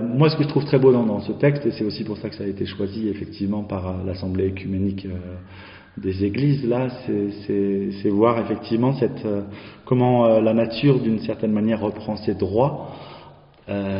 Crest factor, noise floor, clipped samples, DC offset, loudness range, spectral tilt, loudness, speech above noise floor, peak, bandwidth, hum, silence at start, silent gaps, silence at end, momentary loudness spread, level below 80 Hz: 18 dB; -46 dBFS; under 0.1%; under 0.1%; 6 LU; -7 dB/octave; -22 LUFS; 25 dB; -2 dBFS; 5.4 kHz; none; 0 s; none; 0 s; 14 LU; -54 dBFS